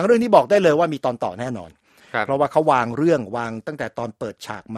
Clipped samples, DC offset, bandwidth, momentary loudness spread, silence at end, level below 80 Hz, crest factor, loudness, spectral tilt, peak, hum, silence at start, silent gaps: under 0.1%; under 0.1%; 13.5 kHz; 15 LU; 0 s; -60 dBFS; 20 dB; -20 LUFS; -6.5 dB/octave; 0 dBFS; none; 0 s; none